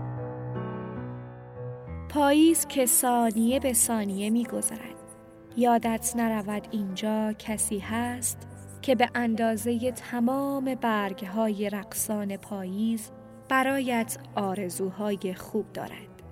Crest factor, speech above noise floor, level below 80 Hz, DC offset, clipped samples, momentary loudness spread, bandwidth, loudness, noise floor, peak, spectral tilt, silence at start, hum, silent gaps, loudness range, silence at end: 18 dB; 21 dB; -58 dBFS; under 0.1%; under 0.1%; 16 LU; 16 kHz; -27 LUFS; -48 dBFS; -8 dBFS; -4 dB/octave; 0 s; none; none; 6 LU; 0 s